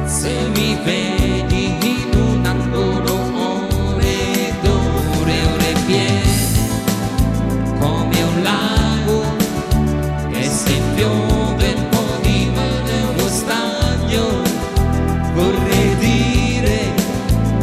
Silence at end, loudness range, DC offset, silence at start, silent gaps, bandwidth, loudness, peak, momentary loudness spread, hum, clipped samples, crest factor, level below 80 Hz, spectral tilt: 0 s; 1 LU; under 0.1%; 0 s; none; 15.5 kHz; -17 LUFS; -4 dBFS; 4 LU; none; under 0.1%; 12 dB; -24 dBFS; -5 dB/octave